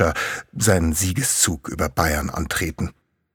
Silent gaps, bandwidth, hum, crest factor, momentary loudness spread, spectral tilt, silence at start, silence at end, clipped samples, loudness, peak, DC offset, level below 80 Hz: none; over 20 kHz; none; 20 dB; 9 LU; -3.5 dB/octave; 0 s; 0.45 s; under 0.1%; -21 LUFS; -2 dBFS; under 0.1%; -34 dBFS